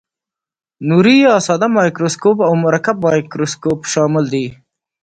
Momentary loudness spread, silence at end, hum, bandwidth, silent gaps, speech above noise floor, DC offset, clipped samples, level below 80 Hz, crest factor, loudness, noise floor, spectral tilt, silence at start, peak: 9 LU; 0.5 s; none; 9.2 kHz; none; 73 dB; under 0.1%; under 0.1%; -56 dBFS; 14 dB; -14 LUFS; -86 dBFS; -5.5 dB/octave; 0.8 s; 0 dBFS